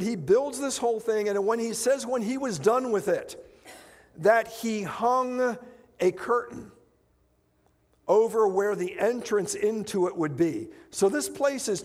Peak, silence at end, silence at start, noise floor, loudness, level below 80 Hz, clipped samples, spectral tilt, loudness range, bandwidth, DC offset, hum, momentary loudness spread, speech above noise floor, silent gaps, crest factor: -8 dBFS; 0 s; 0 s; -67 dBFS; -26 LUFS; -66 dBFS; under 0.1%; -4.5 dB/octave; 3 LU; 16 kHz; under 0.1%; none; 7 LU; 41 dB; none; 20 dB